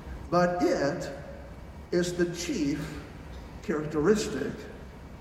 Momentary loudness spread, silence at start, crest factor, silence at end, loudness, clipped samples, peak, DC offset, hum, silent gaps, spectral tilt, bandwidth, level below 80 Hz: 19 LU; 0 s; 20 dB; 0 s; -29 LUFS; under 0.1%; -10 dBFS; under 0.1%; none; none; -5.5 dB/octave; 15 kHz; -48 dBFS